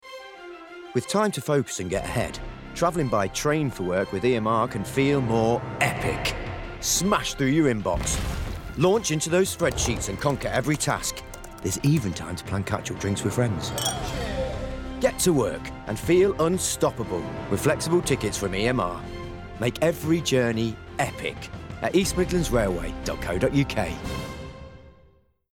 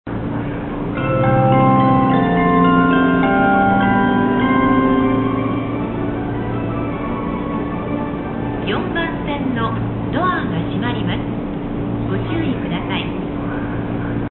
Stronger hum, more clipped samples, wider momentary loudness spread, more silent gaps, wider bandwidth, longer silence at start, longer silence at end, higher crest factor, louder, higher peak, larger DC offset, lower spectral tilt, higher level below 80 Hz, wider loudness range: neither; neither; about the same, 12 LU vs 10 LU; neither; first, 18 kHz vs 4.2 kHz; about the same, 0.05 s vs 0.05 s; first, 0.6 s vs 0 s; about the same, 16 dB vs 16 dB; second, -25 LUFS vs -18 LUFS; second, -8 dBFS vs -2 dBFS; neither; second, -4.5 dB/octave vs -12.5 dB/octave; second, -40 dBFS vs -34 dBFS; second, 3 LU vs 8 LU